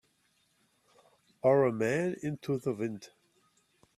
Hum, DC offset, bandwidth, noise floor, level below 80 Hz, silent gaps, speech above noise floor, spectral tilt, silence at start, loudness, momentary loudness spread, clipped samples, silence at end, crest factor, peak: none; under 0.1%; 13.5 kHz; -73 dBFS; -72 dBFS; none; 43 dB; -7 dB/octave; 1.45 s; -31 LUFS; 11 LU; under 0.1%; 0.9 s; 20 dB; -14 dBFS